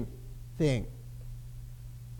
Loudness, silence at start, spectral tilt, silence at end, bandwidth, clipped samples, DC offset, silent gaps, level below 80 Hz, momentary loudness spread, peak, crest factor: -34 LUFS; 0 s; -7 dB/octave; 0 s; 18 kHz; under 0.1%; under 0.1%; none; -46 dBFS; 17 LU; -16 dBFS; 20 dB